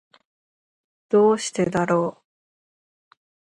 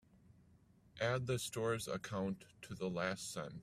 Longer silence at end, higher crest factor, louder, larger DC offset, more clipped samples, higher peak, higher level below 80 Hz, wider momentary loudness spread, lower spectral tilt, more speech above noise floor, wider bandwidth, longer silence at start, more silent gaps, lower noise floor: first, 1.35 s vs 0 s; about the same, 18 dB vs 20 dB; first, -21 LUFS vs -41 LUFS; neither; neither; first, -8 dBFS vs -22 dBFS; first, -64 dBFS vs -70 dBFS; second, 5 LU vs 8 LU; about the same, -5.5 dB/octave vs -4.5 dB/octave; first, over 70 dB vs 27 dB; second, 11.5 kHz vs 15.5 kHz; first, 1.1 s vs 0.95 s; neither; first, under -90 dBFS vs -68 dBFS